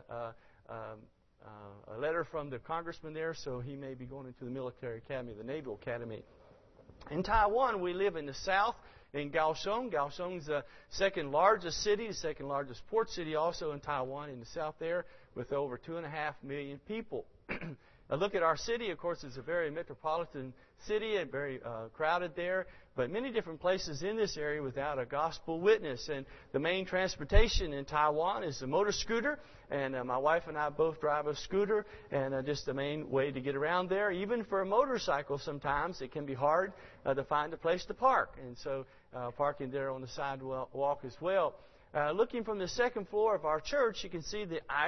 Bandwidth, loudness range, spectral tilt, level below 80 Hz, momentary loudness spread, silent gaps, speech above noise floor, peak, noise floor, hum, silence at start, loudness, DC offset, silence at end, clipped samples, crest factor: 6.2 kHz; 7 LU; -3.5 dB/octave; -48 dBFS; 13 LU; none; 26 dB; -12 dBFS; -60 dBFS; none; 0.1 s; -35 LUFS; under 0.1%; 0 s; under 0.1%; 24 dB